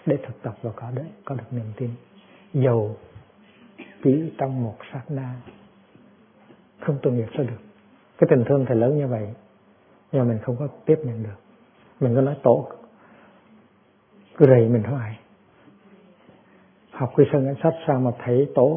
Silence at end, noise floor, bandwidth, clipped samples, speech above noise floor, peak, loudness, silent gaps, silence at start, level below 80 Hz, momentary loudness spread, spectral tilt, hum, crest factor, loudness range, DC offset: 0 s; -58 dBFS; 3.6 kHz; under 0.1%; 37 dB; 0 dBFS; -23 LUFS; none; 0.05 s; -64 dBFS; 16 LU; -13 dB/octave; none; 24 dB; 6 LU; under 0.1%